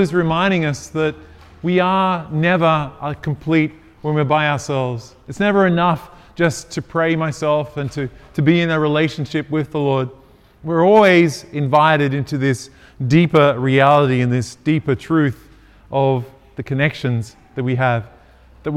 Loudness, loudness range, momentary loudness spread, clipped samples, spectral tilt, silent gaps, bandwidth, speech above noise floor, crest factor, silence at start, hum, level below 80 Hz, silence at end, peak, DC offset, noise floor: -17 LUFS; 4 LU; 13 LU; under 0.1%; -6.5 dB/octave; none; 13 kHz; 29 dB; 18 dB; 0 s; none; -48 dBFS; 0 s; 0 dBFS; under 0.1%; -46 dBFS